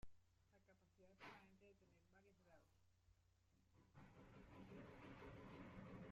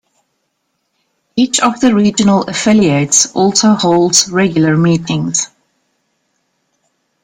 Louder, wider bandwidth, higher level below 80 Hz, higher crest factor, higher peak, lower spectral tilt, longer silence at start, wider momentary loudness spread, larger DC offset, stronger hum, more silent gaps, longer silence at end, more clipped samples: second, -63 LUFS vs -11 LUFS; second, 7.6 kHz vs 16.5 kHz; second, -76 dBFS vs -50 dBFS; about the same, 16 dB vs 14 dB; second, -48 dBFS vs 0 dBFS; first, -5.5 dB/octave vs -4 dB/octave; second, 0 s vs 1.35 s; about the same, 7 LU vs 6 LU; neither; neither; neither; second, 0 s vs 1.8 s; neither